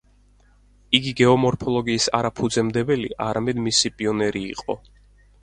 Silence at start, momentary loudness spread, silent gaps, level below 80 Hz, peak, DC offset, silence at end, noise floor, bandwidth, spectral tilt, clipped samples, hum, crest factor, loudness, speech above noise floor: 0.9 s; 11 LU; none; -50 dBFS; 0 dBFS; under 0.1%; 0.65 s; -56 dBFS; 11 kHz; -4 dB/octave; under 0.1%; 50 Hz at -50 dBFS; 22 dB; -21 LUFS; 34 dB